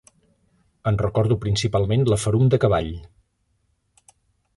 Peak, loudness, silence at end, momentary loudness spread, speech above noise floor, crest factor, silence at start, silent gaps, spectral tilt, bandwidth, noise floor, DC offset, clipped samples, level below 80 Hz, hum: -4 dBFS; -21 LUFS; 1.5 s; 9 LU; 49 dB; 20 dB; 0.85 s; none; -6.5 dB/octave; 11.5 kHz; -69 dBFS; under 0.1%; under 0.1%; -42 dBFS; none